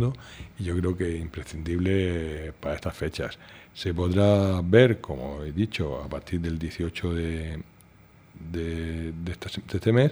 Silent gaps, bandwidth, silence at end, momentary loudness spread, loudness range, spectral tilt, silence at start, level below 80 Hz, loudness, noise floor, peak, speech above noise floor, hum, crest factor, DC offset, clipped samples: none; over 20 kHz; 0 s; 15 LU; 8 LU; -7.5 dB/octave; 0 s; -42 dBFS; -27 LUFS; -54 dBFS; -4 dBFS; 28 dB; none; 24 dB; under 0.1%; under 0.1%